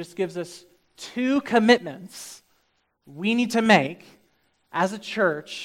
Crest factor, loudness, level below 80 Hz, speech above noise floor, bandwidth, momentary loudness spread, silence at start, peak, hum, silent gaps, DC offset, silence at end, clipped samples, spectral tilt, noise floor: 24 dB; -22 LUFS; -70 dBFS; 46 dB; 15.5 kHz; 20 LU; 0 s; -2 dBFS; none; none; under 0.1%; 0 s; under 0.1%; -4.5 dB/octave; -70 dBFS